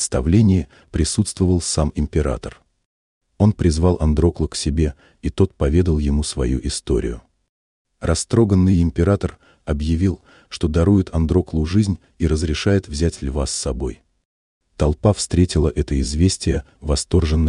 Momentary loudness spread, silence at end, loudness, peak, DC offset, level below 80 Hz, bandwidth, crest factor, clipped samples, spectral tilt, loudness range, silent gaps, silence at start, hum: 9 LU; 0 s; -19 LUFS; -2 dBFS; under 0.1%; -30 dBFS; 11 kHz; 16 dB; under 0.1%; -6 dB/octave; 3 LU; 2.85-3.21 s, 7.49-7.85 s, 14.25-14.61 s; 0 s; none